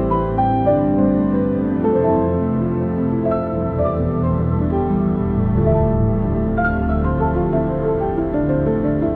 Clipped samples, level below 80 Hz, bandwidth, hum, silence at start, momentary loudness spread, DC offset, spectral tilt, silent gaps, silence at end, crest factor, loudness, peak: under 0.1%; -30 dBFS; 4.3 kHz; none; 0 s; 3 LU; under 0.1%; -12 dB/octave; none; 0 s; 12 dB; -18 LUFS; -4 dBFS